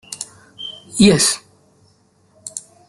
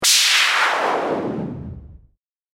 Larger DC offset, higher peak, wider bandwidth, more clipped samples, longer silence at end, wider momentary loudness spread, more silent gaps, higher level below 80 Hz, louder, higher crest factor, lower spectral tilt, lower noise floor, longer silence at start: neither; about the same, -2 dBFS vs -2 dBFS; second, 12.5 kHz vs 16.5 kHz; neither; second, 0.3 s vs 0.55 s; about the same, 21 LU vs 19 LU; neither; about the same, -48 dBFS vs -48 dBFS; about the same, -15 LUFS vs -17 LUFS; about the same, 18 dB vs 18 dB; first, -3.5 dB/octave vs -1 dB/octave; about the same, -57 dBFS vs -59 dBFS; about the same, 0.1 s vs 0 s